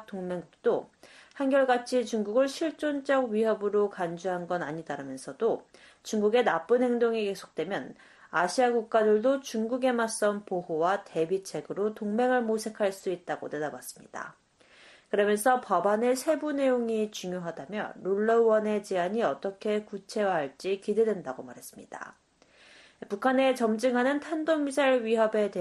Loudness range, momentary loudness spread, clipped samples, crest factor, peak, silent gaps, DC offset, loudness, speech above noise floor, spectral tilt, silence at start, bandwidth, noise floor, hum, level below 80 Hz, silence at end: 4 LU; 12 LU; under 0.1%; 18 dB; -12 dBFS; none; under 0.1%; -28 LUFS; 31 dB; -4.5 dB/octave; 0 s; 12.5 kHz; -60 dBFS; none; -74 dBFS; 0 s